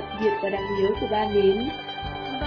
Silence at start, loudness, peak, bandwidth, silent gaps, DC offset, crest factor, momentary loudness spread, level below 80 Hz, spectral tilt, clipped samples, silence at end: 0 s; -25 LUFS; -10 dBFS; 5.4 kHz; none; under 0.1%; 14 dB; 11 LU; -44 dBFS; -7.5 dB/octave; under 0.1%; 0 s